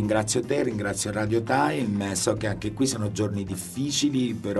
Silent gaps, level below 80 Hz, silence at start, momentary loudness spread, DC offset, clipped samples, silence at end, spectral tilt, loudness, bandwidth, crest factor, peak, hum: none; -52 dBFS; 0 s; 5 LU; under 0.1%; under 0.1%; 0 s; -4.5 dB/octave; -26 LUFS; 12 kHz; 18 dB; -8 dBFS; none